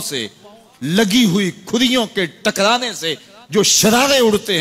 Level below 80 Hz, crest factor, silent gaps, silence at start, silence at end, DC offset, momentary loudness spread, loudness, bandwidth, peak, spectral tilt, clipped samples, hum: -52 dBFS; 16 dB; none; 0 s; 0 s; under 0.1%; 12 LU; -15 LUFS; 16 kHz; -2 dBFS; -3 dB/octave; under 0.1%; none